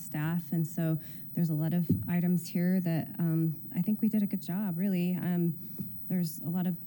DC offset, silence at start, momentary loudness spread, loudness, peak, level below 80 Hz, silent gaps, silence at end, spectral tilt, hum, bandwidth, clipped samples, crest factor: under 0.1%; 0 s; 4 LU; -31 LUFS; -14 dBFS; -68 dBFS; none; 0 s; -8 dB/octave; none; 17 kHz; under 0.1%; 16 dB